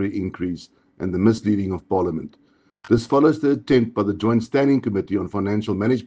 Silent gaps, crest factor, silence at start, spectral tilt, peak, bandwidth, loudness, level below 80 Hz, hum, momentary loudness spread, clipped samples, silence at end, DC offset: none; 16 dB; 0 s; -8 dB/octave; -4 dBFS; 9 kHz; -21 LUFS; -52 dBFS; none; 11 LU; under 0.1%; 0 s; under 0.1%